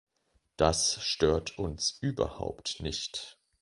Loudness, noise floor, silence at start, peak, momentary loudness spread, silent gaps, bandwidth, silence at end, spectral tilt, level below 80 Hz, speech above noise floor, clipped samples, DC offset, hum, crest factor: -30 LUFS; -74 dBFS; 0.6 s; -8 dBFS; 10 LU; none; 11.5 kHz; 0.3 s; -3.5 dB/octave; -46 dBFS; 43 dB; under 0.1%; under 0.1%; none; 24 dB